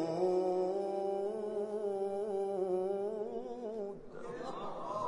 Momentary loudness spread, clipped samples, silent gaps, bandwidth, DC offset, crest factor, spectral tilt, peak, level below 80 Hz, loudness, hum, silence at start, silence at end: 10 LU; under 0.1%; none; 11 kHz; under 0.1%; 14 dB; -7 dB/octave; -22 dBFS; -70 dBFS; -37 LUFS; none; 0 s; 0 s